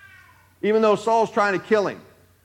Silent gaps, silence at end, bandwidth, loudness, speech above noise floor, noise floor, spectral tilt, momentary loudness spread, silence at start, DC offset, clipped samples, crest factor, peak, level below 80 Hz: none; 0.45 s; 11 kHz; -21 LUFS; 32 dB; -52 dBFS; -5.5 dB/octave; 10 LU; 0.65 s; under 0.1%; under 0.1%; 16 dB; -6 dBFS; -70 dBFS